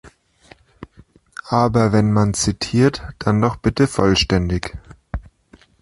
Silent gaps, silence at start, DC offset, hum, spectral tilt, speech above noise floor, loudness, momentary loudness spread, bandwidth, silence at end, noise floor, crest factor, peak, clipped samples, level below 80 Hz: none; 0.05 s; under 0.1%; none; -5.5 dB/octave; 34 dB; -18 LUFS; 17 LU; 11.5 kHz; 0.6 s; -51 dBFS; 18 dB; 0 dBFS; under 0.1%; -36 dBFS